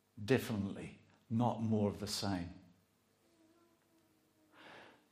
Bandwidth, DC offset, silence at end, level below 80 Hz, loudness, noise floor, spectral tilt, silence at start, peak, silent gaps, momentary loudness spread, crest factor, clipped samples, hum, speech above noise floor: 15.5 kHz; under 0.1%; 0.2 s; -74 dBFS; -37 LUFS; -74 dBFS; -6 dB/octave; 0.15 s; -16 dBFS; none; 22 LU; 24 dB; under 0.1%; none; 38 dB